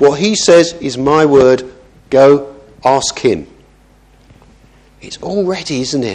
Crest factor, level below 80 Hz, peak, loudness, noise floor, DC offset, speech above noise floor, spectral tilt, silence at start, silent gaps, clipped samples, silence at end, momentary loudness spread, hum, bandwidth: 12 dB; -46 dBFS; 0 dBFS; -12 LUFS; -46 dBFS; under 0.1%; 35 dB; -4.5 dB/octave; 0 s; none; 0.3%; 0 s; 13 LU; none; 10.5 kHz